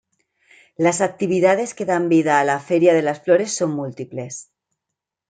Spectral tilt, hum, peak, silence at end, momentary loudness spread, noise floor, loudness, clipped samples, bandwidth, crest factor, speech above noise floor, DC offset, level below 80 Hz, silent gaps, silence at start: -5 dB/octave; none; -2 dBFS; 0.85 s; 14 LU; -83 dBFS; -19 LUFS; under 0.1%; 9.4 kHz; 18 dB; 65 dB; under 0.1%; -68 dBFS; none; 0.8 s